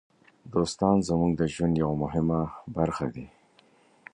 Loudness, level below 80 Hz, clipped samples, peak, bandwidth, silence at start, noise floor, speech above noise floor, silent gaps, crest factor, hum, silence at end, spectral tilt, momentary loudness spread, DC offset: -27 LUFS; -48 dBFS; under 0.1%; -8 dBFS; 10.5 kHz; 0.45 s; -61 dBFS; 35 dB; none; 20 dB; none; 0.85 s; -7 dB/octave; 9 LU; under 0.1%